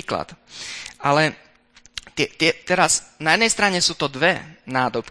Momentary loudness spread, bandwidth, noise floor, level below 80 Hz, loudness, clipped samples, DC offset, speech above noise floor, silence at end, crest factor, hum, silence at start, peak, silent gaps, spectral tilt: 15 LU; 11 kHz; -53 dBFS; -54 dBFS; -20 LUFS; under 0.1%; under 0.1%; 32 dB; 0 s; 22 dB; none; 0.1 s; 0 dBFS; none; -2.5 dB/octave